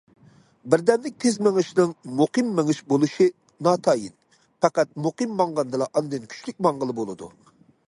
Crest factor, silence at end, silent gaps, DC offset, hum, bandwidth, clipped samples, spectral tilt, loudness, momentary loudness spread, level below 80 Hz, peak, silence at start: 20 dB; 0.6 s; none; under 0.1%; none; 11.5 kHz; under 0.1%; -5.5 dB/octave; -23 LUFS; 11 LU; -68 dBFS; -2 dBFS; 0.65 s